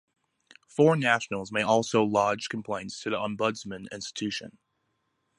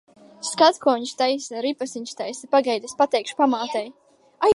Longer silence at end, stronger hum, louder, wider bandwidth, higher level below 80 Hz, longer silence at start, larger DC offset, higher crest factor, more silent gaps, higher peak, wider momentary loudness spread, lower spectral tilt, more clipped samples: first, 0.9 s vs 0 s; neither; second, -27 LUFS vs -23 LUFS; about the same, 11.5 kHz vs 11.5 kHz; about the same, -66 dBFS vs -64 dBFS; first, 0.75 s vs 0.4 s; neither; about the same, 22 dB vs 20 dB; neither; about the same, -6 dBFS vs -4 dBFS; about the same, 14 LU vs 13 LU; first, -5 dB/octave vs -2.5 dB/octave; neither